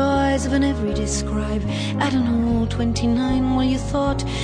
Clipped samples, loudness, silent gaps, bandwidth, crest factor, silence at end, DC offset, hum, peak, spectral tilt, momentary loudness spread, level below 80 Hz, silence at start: under 0.1%; -21 LUFS; none; 10.5 kHz; 14 dB; 0 s; under 0.1%; none; -6 dBFS; -5.5 dB/octave; 4 LU; -30 dBFS; 0 s